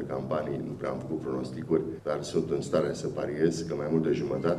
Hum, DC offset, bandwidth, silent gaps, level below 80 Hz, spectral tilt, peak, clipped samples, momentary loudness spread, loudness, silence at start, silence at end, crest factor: none; under 0.1%; 12.5 kHz; none; -58 dBFS; -6.5 dB/octave; -12 dBFS; under 0.1%; 6 LU; -30 LUFS; 0 s; 0 s; 18 dB